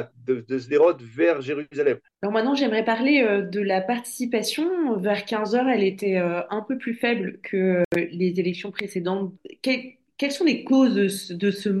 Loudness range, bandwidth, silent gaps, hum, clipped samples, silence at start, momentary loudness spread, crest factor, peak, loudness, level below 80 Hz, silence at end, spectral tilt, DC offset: 3 LU; 12.5 kHz; 7.85-7.91 s; none; under 0.1%; 0 s; 9 LU; 16 dB; -8 dBFS; -23 LUFS; -70 dBFS; 0 s; -5.5 dB/octave; under 0.1%